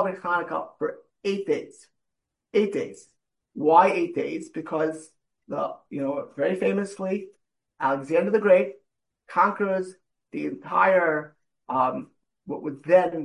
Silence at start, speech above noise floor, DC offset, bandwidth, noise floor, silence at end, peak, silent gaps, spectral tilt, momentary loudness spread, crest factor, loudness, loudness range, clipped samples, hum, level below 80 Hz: 0 s; 58 dB; under 0.1%; 11.5 kHz; -83 dBFS; 0 s; -4 dBFS; none; -6.5 dB/octave; 14 LU; 22 dB; -25 LUFS; 5 LU; under 0.1%; none; -76 dBFS